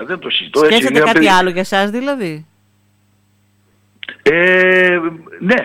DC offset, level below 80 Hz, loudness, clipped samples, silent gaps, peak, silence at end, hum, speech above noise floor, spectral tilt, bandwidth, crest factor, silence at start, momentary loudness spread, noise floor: under 0.1%; -52 dBFS; -12 LUFS; under 0.1%; none; -2 dBFS; 0 s; 50 Hz at -50 dBFS; 43 dB; -4.5 dB/octave; 16.5 kHz; 14 dB; 0 s; 15 LU; -56 dBFS